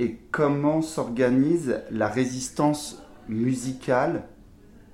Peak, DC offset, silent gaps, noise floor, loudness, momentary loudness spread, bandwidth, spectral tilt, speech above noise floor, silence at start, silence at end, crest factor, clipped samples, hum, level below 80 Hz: -10 dBFS; under 0.1%; none; -50 dBFS; -25 LUFS; 9 LU; 15.5 kHz; -6 dB/octave; 25 dB; 0 s; 0.6 s; 16 dB; under 0.1%; none; -54 dBFS